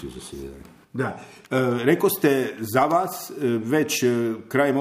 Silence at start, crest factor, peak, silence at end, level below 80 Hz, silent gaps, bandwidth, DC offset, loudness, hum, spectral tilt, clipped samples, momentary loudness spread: 0 s; 20 dB; -4 dBFS; 0 s; -56 dBFS; none; 15.5 kHz; under 0.1%; -23 LUFS; none; -5 dB/octave; under 0.1%; 16 LU